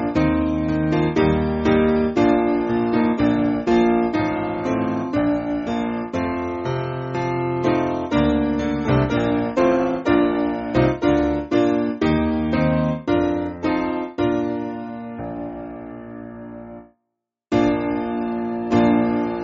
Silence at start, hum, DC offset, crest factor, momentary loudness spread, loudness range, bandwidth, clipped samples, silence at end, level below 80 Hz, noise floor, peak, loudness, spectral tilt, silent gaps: 0 s; none; under 0.1%; 16 dB; 12 LU; 7 LU; 7.2 kHz; under 0.1%; 0 s; -38 dBFS; -80 dBFS; -6 dBFS; -20 LUFS; -6.5 dB/octave; none